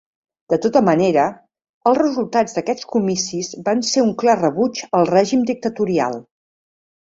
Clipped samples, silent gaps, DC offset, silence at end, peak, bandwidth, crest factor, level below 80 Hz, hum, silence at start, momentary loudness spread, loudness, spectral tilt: under 0.1%; 1.69-1.81 s; under 0.1%; 0.85 s; -2 dBFS; 7.8 kHz; 16 dB; -60 dBFS; none; 0.5 s; 7 LU; -18 LUFS; -5 dB/octave